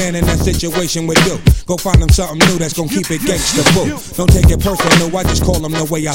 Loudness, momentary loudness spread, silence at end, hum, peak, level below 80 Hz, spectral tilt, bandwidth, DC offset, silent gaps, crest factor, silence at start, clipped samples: -13 LUFS; 6 LU; 0 s; none; 0 dBFS; -18 dBFS; -4.5 dB/octave; 17 kHz; under 0.1%; none; 12 dB; 0 s; 0.2%